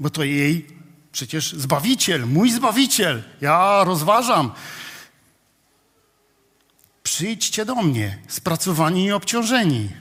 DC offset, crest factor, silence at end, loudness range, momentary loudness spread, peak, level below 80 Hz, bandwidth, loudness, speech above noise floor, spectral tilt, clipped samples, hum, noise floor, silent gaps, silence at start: under 0.1%; 18 dB; 0 s; 8 LU; 10 LU; -4 dBFS; -62 dBFS; 16 kHz; -19 LUFS; 43 dB; -4 dB/octave; under 0.1%; none; -62 dBFS; none; 0 s